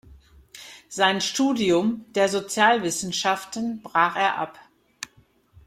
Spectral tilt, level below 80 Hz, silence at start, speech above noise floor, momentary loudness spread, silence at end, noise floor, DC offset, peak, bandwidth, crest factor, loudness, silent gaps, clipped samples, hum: -3 dB/octave; -60 dBFS; 0.1 s; 36 dB; 19 LU; 0.6 s; -59 dBFS; under 0.1%; -4 dBFS; 16 kHz; 20 dB; -23 LUFS; none; under 0.1%; none